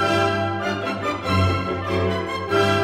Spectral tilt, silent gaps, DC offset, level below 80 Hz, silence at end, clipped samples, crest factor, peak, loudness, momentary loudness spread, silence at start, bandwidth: -6 dB/octave; none; under 0.1%; -48 dBFS; 0 s; under 0.1%; 14 dB; -6 dBFS; -22 LUFS; 5 LU; 0 s; 15 kHz